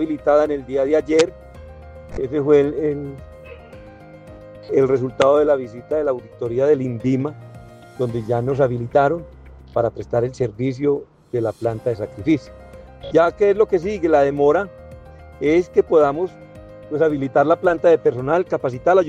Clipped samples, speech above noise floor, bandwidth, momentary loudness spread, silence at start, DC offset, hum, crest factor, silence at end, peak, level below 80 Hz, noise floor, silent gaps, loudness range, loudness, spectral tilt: under 0.1%; 23 dB; 9.2 kHz; 13 LU; 0 s; under 0.1%; none; 16 dB; 0 s; -2 dBFS; -46 dBFS; -41 dBFS; none; 4 LU; -19 LUFS; -7 dB/octave